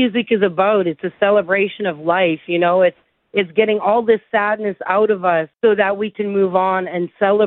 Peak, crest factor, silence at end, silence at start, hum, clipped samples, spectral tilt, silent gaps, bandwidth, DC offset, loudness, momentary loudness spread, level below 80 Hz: -2 dBFS; 14 dB; 0 s; 0 s; none; under 0.1%; -10.5 dB/octave; none; 4.1 kHz; under 0.1%; -17 LUFS; 5 LU; -64 dBFS